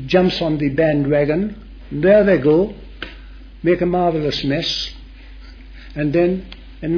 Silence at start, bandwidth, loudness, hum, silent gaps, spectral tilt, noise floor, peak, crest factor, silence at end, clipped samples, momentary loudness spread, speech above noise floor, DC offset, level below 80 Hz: 0 s; 5.4 kHz; -17 LUFS; none; none; -7 dB/octave; -37 dBFS; -2 dBFS; 16 dB; 0 s; under 0.1%; 19 LU; 21 dB; under 0.1%; -38 dBFS